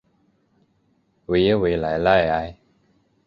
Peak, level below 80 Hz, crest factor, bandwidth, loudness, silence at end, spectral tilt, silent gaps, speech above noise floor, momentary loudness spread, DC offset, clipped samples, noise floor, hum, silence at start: -2 dBFS; -44 dBFS; 20 dB; 6.6 kHz; -20 LUFS; 0.75 s; -8 dB/octave; none; 46 dB; 13 LU; under 0.1%; under 0.1%; -65 dBFS; none; 1.3 s